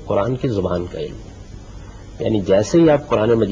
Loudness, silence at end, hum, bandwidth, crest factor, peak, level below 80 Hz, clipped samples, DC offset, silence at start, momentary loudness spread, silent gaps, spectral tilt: -18 LUFS; 0 s; none; 7.6 kHz; 14 dB; -4 dBFS; -40 dBFS; under 0.1%; under 0.1%; 0 s; 24 LU; none; -7 dB/octave